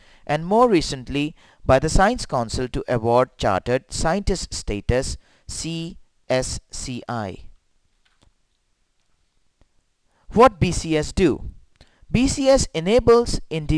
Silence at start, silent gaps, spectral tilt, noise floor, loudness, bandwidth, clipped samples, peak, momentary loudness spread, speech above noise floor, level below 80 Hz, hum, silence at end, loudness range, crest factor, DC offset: 0.3 s; none; -5 dB/octave; -67 dBFS; -21 LUFS; 11 kHz; under 0.1%; -4 dBFS; 15 LU; 47 dB; -34 dBFS; none; 0 s; 10 LU; 18 dB; under 0.1%